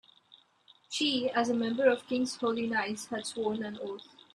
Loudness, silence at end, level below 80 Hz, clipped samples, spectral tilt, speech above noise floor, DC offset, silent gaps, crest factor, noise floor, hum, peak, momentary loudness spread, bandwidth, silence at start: -31 LUFS; 0.3 s; -76 dBFS; under 0.1%; -3.5 dB/octave; 33 dB; under 0.1%; none; 20 dB; -64 dBFS; none; -12 dBFS; 11 LU; 13 kHz; 0.9 s